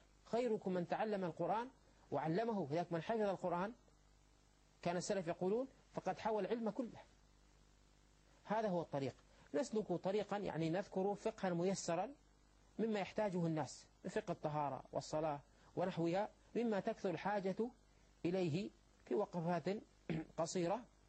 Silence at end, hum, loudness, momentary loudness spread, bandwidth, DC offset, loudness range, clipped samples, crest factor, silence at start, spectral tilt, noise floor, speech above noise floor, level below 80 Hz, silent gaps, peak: 0.2 s; none; -42 LUFS; 7 LU; 8.8 kHz; under 0.1%; 3 LU; under 0.1%; 16 dB; 0.25 s; -6 dB/octave; -71 dBFS; 30 dB; -72 dBFS; none; -26 dBFS